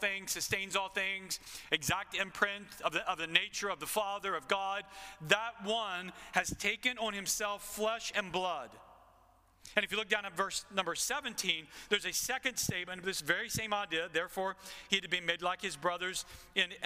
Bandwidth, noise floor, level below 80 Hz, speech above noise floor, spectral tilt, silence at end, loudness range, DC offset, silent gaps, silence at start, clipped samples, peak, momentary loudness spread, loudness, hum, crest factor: 16 kHz; -66 dBFS; -64 dBFS; 30 dB; -1.5 dB/octave; 0 s; 2 LU; under 0.1%; none; 0 s; under 0.1%; -8 dBFS; 6 LU; -34 LUFS; none; 28 dB